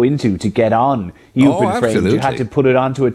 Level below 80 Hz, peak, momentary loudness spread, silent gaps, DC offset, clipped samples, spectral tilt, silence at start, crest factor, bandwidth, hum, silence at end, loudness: -46 dBFS; -2 dBFS; 4 LU; none; under 0.1%; under 0.1%; -7 dB/octave; 0 s; 12 dB; 12 kHz; none; 0 s; -15 LUFS